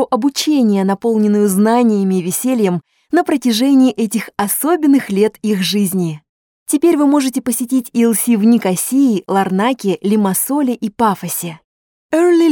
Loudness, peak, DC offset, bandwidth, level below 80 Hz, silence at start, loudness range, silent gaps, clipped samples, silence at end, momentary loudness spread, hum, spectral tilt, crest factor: -15 LUFS; -2 dBFS; under 0.1%; 18 kHz; -60 dBFS; 0 s; 2 LU; 6.29-6.66 s, 11.64-12.09 s; under 0.1%; 0 s; 7 LU; none; -5 dB/octave; 12 dB